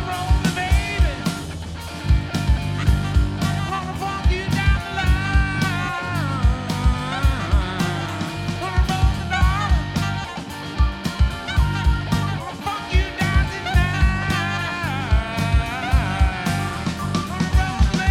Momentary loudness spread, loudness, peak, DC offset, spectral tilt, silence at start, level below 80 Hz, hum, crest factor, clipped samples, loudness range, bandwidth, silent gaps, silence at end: 6 LU; -22 LUFS; -4 dBFS; under 0.1%; -5.5 dB/octave; 0 s; -24 dBFS; none; 16 dB; under 0.1%; 1 LU; 15 kHz; none; 0 s